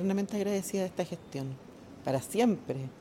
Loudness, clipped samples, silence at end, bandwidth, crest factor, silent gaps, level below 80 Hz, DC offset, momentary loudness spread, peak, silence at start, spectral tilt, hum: -33 LUFS; under 0.1%; 0 s; 17 kHz; 16 dB; none; -66 dBFS; under 0.1%; 12 LU; -16 dBFS; 0 s; -6 dB/octave; none